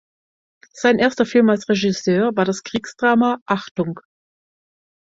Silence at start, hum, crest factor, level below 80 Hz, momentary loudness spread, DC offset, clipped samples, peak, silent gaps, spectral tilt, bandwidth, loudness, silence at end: 0.75 s; none; 18 dB; -58 dBFS; 9 LU; under 0.1%; under 0.1%; -2 dBFS; 3.41-3.46 s, 3.71-3.75 s; -5.5 dB/octave; 7.8 kHz; -19 LUFS; 1.05 s